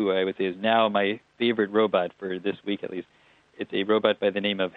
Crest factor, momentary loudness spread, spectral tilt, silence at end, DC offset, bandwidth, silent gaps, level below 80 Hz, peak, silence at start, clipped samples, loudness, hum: 20 dB; 9 LU; -7.5 dB/octave; 0.05 s; under 0.1%; 4.7 kHz; none; -74 dBFS; -6 dBFS; 0 s; under 0.1%; -25 LUFS; none